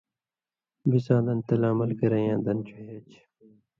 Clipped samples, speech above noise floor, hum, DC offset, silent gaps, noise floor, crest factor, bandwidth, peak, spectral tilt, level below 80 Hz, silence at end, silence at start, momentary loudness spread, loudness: under 0.1%; over 65 dB; none; under 0.1%; none; under -90 dBFS; 20 dB; 6.2 kHz; -8 dBFS; -10.5 dB/octave; -64 dBFS; 0.8 s; 0.85 s; 19 LU; -26 LUFS